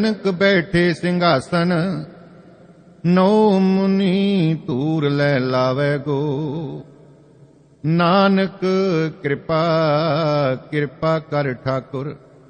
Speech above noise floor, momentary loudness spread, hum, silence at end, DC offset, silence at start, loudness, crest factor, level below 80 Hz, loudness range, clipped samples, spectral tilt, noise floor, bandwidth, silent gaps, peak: 31 dB; 10 LU; none; 0.3 s; under 0.1%; 0 s; -18 LUFS; 16 dB; -54 dBFS; 3 LU; under 0.1%; -7.5 dB/octave; -49 dBFS; 9.4 kHz; none; -2 dBFS